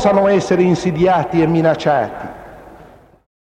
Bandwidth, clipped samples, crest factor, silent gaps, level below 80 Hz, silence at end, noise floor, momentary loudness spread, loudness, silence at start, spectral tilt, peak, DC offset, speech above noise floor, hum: 9.8 kHz; under 0.1%; 16 dB; none; -46 dBFS; 0.55 s; -43 dBFS; 15 LU; -15 LUFS; 0 s; -7 dB/octave; 0 dBFS; under 0.1%; 29 dB; none